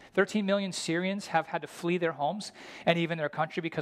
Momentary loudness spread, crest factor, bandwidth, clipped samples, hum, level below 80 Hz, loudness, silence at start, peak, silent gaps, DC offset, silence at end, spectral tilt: 6 LU; 20 dB; 14 kHz; under 0.1%; none; -74 dBFS; -30 LUFS; 0 s; -10 dBFS; none; under 0.1%; 0 s; -5 dB/octave